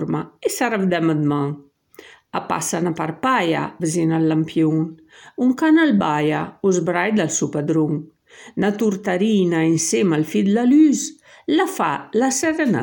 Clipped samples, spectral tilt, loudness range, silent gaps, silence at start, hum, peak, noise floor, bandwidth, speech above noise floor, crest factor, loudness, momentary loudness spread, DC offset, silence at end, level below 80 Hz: under 0.1%; -5 dB/octave; 4 LU; none; 0 s; none; -4 dBFS; -46 dBFS; 17.5 kHz; 27 dB; 14 dB; -19 LUFS; 9 LU; under 0.1%; 0 s; -64 dBFS